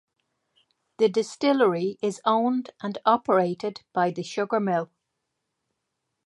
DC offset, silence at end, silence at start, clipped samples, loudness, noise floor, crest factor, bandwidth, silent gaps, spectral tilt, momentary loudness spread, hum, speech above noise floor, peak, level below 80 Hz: under 0.1%; 1.4 s; 1 s; under 0.1%; -25 LUFS; -80 dBFS; 22 dB; 11.5 kHz; none; -5.5 dB/octave; 8 LU; none; 56 dB; -4 dBFS; -78 dBFS